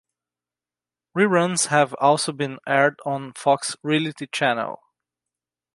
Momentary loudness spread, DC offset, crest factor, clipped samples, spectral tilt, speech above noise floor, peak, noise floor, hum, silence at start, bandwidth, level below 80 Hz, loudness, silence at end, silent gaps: 10 LU; under 0.1%; 20 dB; under 0.1%; -4 dB/octave; over 69 dB; -2 dBFS; under -90 dBFS; 60 Hz at -65 dBFS; 1.15 s; 11.5 kHz; -74 dBFS; -21 LUFS; 1 s; none